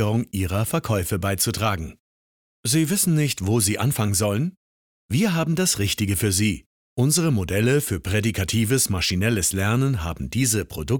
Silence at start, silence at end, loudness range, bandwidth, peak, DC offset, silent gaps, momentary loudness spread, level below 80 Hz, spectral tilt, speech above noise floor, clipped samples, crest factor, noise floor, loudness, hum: 0 s; 0 s; 1 LU; 19.5 kHz; -8 dBFS; 0.1%; 2.00-2.63 s, 4.57-5.09 s, 6.66-6.96 s; 6 LU; -44 dBFS; -4.5 dB/octave; over 68 dB; under 0.1%; 14 dB; under -90 dBFS; -22 LUFS; none